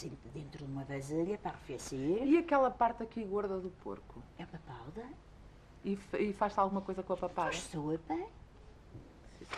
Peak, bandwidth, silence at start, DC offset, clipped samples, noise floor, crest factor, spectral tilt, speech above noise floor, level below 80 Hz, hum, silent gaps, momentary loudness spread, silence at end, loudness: -18 dBFS; 13 kHz; 0 s; under 0.1%; under 0.1%; -56 dBFS; 20 dB; -6 dB/octave; 21 dB; -58 dBFS; none; none; 20 LU; 0 s; -36 LUFS